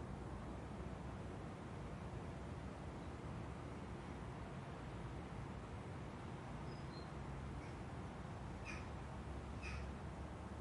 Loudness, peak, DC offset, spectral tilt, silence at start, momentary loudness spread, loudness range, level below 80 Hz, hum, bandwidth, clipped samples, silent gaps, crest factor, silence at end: -50 LUFS; -36 dBFS; under 0.1%; -6.5 dB/octave; 0 s; 2 LU; 1 LU; -56 dBFS; none; 11.5 kHz; under 0.1%; none; 14 dB; 0 s